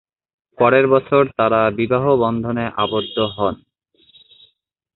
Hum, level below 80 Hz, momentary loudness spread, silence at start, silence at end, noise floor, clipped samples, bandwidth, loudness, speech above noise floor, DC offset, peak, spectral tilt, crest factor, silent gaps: none; -50 dBFS; 8 LU; 0.6 s; 1.4 s; -64 dBFS; under 0.1%; 4.2 kHz; -17 LUFS; 48 dB; under 0.1%; -2 dBFS; -11 dB/octave; 18 dB; none